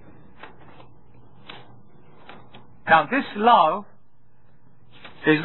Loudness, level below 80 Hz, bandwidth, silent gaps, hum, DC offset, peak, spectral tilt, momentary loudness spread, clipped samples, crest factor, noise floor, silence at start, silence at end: -19 LUFS; -62 dBFS; 4.3 kHz; none; none; 0.8%; -2 dBFS; -8.5 dB/octave; 27 LU; under 0.1%; 22 dB; -61 dBFS; 2.85 s; 0 s